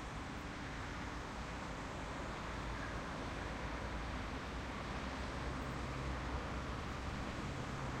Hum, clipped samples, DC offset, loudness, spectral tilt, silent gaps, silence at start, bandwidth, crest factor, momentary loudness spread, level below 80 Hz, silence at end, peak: none; under 0.1%; under 0.1%; -44 LUFS; -5 dB/octave; none; 0 s; 13 kHz; 14 dB; 3 LU; -48 dBFS; 0 s; -30 dBFS